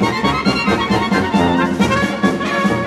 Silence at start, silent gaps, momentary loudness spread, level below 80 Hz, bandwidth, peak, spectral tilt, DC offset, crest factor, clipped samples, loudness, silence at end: 0 s; none; 2 LU; -38 dBFS; 14 kHz; -2 dBFS; -5.5 dB/octave; under 0.1%; 14 dB; under 0.1%; -16 LUFS; 0 s